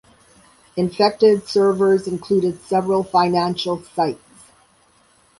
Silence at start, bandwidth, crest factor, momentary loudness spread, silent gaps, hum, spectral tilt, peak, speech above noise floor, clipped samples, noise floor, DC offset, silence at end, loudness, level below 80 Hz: 0.75 s; 11.5 kHz; 16 dB; 9 LU; none; none; -6 dB/octave; -4 dBFS; 39 dB; under 0.1%; -56 dBFS; under 0.1%; 1.25 s; -19 LUFS; -58 dBFS